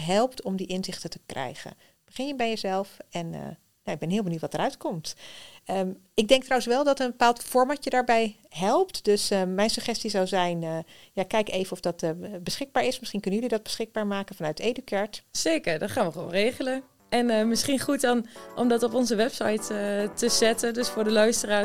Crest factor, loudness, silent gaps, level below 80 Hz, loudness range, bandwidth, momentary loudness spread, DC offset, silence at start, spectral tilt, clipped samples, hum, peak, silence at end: 22 dB; -27 LUFS; none; -58 dBFS; 7 LU; 17.5 kHz; 13 LU; 0.4%; 0 s; -4 dB/octave; under 0.1%; none; -4 dBFS; 0 s